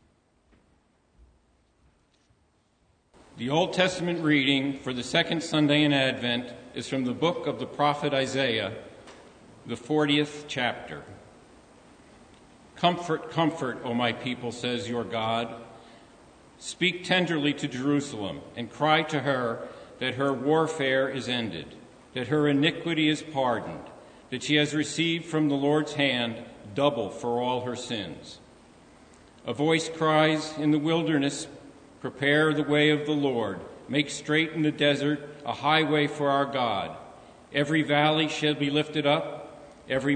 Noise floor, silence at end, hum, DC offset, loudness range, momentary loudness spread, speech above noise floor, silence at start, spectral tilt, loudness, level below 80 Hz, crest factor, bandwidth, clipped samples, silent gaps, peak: -67 dBFS; 0 s; none; under 0.1%; 6 LU; 15 LU; 41 dB; 3.35 s; -5 dB/octave; -26 LUFS; -64 dBFS; 20 dB; 9.6 kHz; under 0.1%; none; -6 dBFS